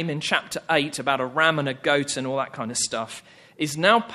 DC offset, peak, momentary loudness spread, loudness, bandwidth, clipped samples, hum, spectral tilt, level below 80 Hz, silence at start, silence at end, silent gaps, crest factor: under 0.1%; -2 dBFS; 9 LU; -23 LUFS; 13.5 kHz; under 0.1%; none; -3 dB/octave; -66 dBFS; 0 s; 0 s; none; 24 dB